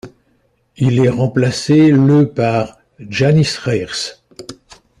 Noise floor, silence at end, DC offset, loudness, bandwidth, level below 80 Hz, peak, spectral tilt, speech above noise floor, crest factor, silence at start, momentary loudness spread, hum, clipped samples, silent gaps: -59 dBFS; 0.5 s; under 0.1%; -14 LUFS; 11 kHz; -48 dBFS; -2 dBFS; -6.5 dB/octave; 46 dB; 14 dB; 0.05 s; 18 LU; none; under 0.1%; none